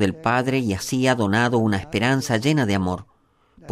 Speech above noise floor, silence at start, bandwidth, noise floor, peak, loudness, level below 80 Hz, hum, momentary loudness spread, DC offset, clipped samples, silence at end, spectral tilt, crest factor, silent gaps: 36 dB; 0 s; 15.5 kHz; -57 dBFS; -4 dBFS; -21 LUFS; -52 dBFS; none; 5 LU; under 0.1%; under 0.1%; 0 s; -5.5 dB/octave; 16 dB; none